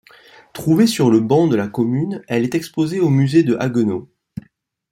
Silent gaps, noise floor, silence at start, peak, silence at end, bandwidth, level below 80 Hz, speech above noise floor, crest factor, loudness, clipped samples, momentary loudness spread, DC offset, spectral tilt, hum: none; -55 dBFS; 0.55 s; -2 dBFS; 0.85 s; 16 kHz; -56 dBFS; 39 dB; 16 dB; -17 LUFS; under 0.1%; 21 LU; under 0.1%; -7 dB/octave; none